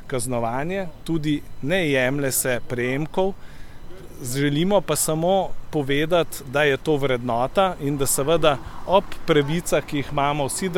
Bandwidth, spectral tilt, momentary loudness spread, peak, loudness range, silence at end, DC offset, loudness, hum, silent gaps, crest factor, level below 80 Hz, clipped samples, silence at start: 17.5 kHz; -4.5 dB/octave; 7 LU; -2 dBFS; 3 LU; 0 s; under 0.1%; -22 LUFS; none; none; 18 dB; -40 dBFS; under 0.1%; 0 s